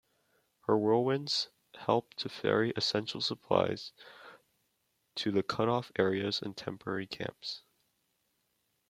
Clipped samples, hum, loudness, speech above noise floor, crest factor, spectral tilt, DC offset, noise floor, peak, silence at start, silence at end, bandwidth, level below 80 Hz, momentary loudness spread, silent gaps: under 0.1%; none; -33 LUFS; 46 dB; 24 dB; -5 dB/octave; under 0.1%; -78 dBFS; -10 dBFS; 0.7 s; 1.3 s; 14 kHz; -74 dBFS; 12 LU; none